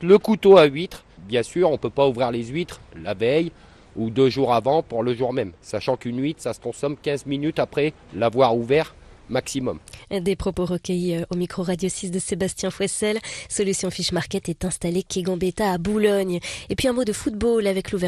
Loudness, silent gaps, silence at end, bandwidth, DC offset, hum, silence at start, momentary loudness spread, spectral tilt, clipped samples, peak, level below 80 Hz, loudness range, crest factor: -22 LUFS; none; 0 s; 13.5 kHz; under 0.1%; none; 0 s; 10 LU; -5 dB/octave; under 0.1%; -2 dBFS; -46 dBFS; 3 LU; 20 dB